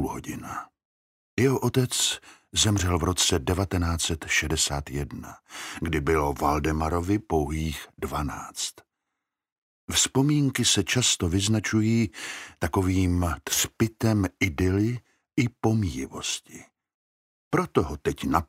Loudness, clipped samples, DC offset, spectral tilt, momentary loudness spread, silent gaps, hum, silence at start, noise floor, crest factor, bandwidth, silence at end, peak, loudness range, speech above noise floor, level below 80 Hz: -25 LUFS; under 0.1%; under 0.1%; -4 dB/octave; 12 LU; 0.85-1.37 s, 9.52-9.88 s, 16.94-17.51 s; none; 0 s; -85 dBFS; 22 dB; 16 kHz; 0.05 s; -6 dBFS; 5 LU; 59 dB; -42 dBFS